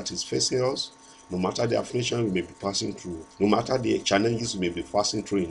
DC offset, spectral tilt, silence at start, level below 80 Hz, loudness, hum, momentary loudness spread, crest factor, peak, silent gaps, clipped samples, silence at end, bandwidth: under 0.1%; -4 dB/octave; 0 s; -56 dBFS; -26 LUFS; none; 9 LU; 20 dB; -6 dBFS; none; under 0.1%; 0 s; 11.5 kHz